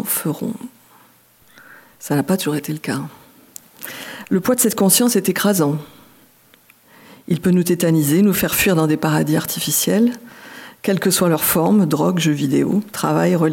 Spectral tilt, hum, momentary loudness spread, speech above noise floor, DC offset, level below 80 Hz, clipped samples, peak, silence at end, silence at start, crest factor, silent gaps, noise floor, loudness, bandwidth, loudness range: -4.5 dB/octave; none; 16 LU; 35 dB; under 0.1%; -54 dBFS; under 0.1%; 0 dBFS; 0 s; 0 s; 18 dB; none; -52 dBFS; -17 LUFS; 17 kHz; 8 LU